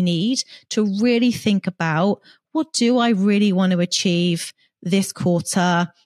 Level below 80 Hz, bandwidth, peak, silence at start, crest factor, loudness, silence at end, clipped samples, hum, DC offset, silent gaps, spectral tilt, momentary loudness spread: -64 dBFS; 14 kHz; -6 dBFS; 0 s; 12 dB; -20 LUFS; 0.2 s; under 0.1%; none; under 0.1%; none; -5 dB/octave; 8 LU